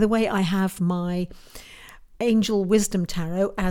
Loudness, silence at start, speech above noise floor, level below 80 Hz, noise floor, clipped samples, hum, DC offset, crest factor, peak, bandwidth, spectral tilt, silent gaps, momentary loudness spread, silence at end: -24 LUFS; 0 s; 23 dB; -44 dBFS; -46 dBFS; under 0.1%; none; under 0.1%; 16 dB; -6 dBFS; 17.5 kHz; -5.5 dB/octave; none; 20 LU; 0 s